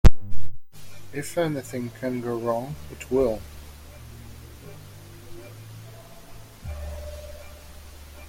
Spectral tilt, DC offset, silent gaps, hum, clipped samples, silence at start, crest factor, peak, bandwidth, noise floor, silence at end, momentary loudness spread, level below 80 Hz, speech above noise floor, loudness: -6.5 dB/octave; under 0.1%; none; none; under 0.1%; 0.05 s; 20 dB; -2 dBFS; 16 kHz; -44 dBFS; 0.8 s; 19 LU; -32 dBFS; 16 dB; -29 LUFS